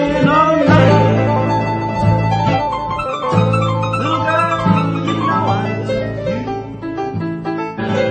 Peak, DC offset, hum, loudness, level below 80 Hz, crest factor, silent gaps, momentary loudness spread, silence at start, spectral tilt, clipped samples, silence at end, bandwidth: 0 dBFS; under 0.1%; none; -16 LUFS; -38 dBFS; 16 dB; none; 11 LU; 0 s; -7.5 dB/octave; under 0.1%; 0 s; 8.8 kHz